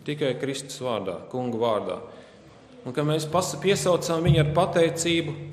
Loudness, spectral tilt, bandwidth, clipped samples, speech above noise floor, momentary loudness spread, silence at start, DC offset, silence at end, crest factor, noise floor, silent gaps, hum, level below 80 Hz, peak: -25 LUFS; -5 dB/octave; 14.5 kHz; under 0.1%; 25 dB; 11 LU; 0 s; under 0.1%; 0 s; 18 dB; -49 dBFS; none; none; -48 dBFS; -8 dBFS